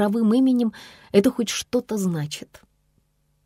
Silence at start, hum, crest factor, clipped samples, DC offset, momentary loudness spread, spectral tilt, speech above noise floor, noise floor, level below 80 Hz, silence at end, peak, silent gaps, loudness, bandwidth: 0 s; none; 20 dB; under 0.1%; under 0.1%; 12 LU; -5.5 dB/octave; 44 dB; -66 dBFS; -60 dBFS; 1 s; -4 dBFS; none; -22 LUFS; 16 kHz